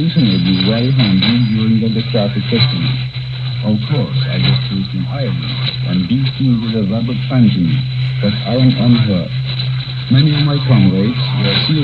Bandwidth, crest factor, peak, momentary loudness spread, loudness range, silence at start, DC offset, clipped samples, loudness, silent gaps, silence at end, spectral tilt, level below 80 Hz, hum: 5.2 kHz; 14 dB; 0 dBFS; 7 LU; 3 LU; 0 s; under 0.1%; under 0.1%; -14 LUFS; none; 0 s; -9 dB/octave; -40 dBFS; none